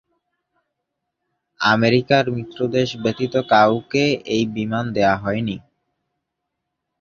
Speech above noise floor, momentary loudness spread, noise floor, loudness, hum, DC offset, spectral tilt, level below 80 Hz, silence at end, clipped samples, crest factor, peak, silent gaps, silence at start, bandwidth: 60 dB; 9 LU; -79 dBFS; -19 LUFS; none; under 0.1%; -6 dB/octave; -54 dBFS; 1.4 s; under 0.1%; 20 dB; -2 dBFS; none; 1.6 s; 7.2 kHz